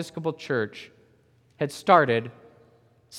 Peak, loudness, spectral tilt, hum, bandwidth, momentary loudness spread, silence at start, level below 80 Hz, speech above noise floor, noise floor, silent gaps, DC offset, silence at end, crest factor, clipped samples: -4 dBFS; -24 LUFS; -5.5 dB/octave; none; 15 kHz; 18 LU; 0 s; -74 dBFS; 37 dB; -61 dBFS; none; under 0.1%; 0 s; 24 dB; under 0.1%